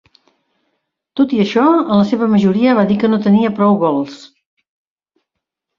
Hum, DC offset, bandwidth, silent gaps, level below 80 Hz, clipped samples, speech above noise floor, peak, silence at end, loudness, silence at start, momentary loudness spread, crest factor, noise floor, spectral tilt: none; under 0.1%; 7.2 kHz; none; -56 dBFS; under 0.1%; 65 dB; -2 dBFS; 1.5 s; -13 LUFS; 1.15 s; 6 LU; 14 dB; -78 dBFS; -8 dB/octave